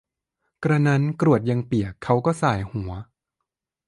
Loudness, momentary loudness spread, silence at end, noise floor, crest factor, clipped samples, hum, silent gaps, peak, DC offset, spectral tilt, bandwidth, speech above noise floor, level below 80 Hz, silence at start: -22 LUFS; 11 LU; 0.85 s; -83 dBFS; 18 dB; under 0.1%; none; none; -4 dBFS; under 0.1%; -8 dB/octave; 11.5 kHz; 61 dB; -48 dBFS; 0.6 s